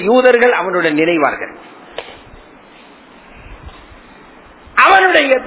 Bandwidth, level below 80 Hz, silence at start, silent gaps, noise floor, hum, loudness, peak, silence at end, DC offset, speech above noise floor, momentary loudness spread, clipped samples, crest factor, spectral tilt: 4 kHz; -46 dBFS; 0 s; none; -41 dBFS; none; -11 LUFS; 0 dBFS; 0 s; under 0.1%; 29 dB; 22 LU; 0.2%; 14 dB; -8 dB/octave